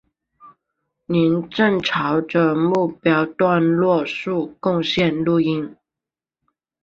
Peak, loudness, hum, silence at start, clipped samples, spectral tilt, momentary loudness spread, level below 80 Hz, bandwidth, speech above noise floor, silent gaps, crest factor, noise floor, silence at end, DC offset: -4 dBFS; -19 LUFS; none; 0.45 s; under 0.1%; -7 dB/octave; 6 LU; -58 dBFS; 7.4 kHz; 70 dB; none; 16 dB; -88 dBFS; 1.1 s; under 0.1%